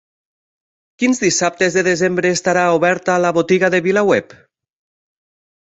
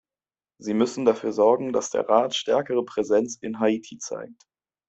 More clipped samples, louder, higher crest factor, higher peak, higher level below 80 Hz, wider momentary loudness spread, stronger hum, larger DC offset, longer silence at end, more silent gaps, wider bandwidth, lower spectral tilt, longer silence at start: neither; first, -15 LUFS vs -24 LUFS; about the same, 16 dB vs 20 dB; about the same, -2 dBFS vs -4 dBFS; first, -58 dBFS vs -68 dBFS; second, 2 LU vs 13 LU; neither; neither; first, 1.55 s vs 0.55 s; neither; about the same, 8.2 kHz vs 8.2 kHz; about the same, -4 dB/octave vs -4 dB/octave; first, 1 s vs 0.6 s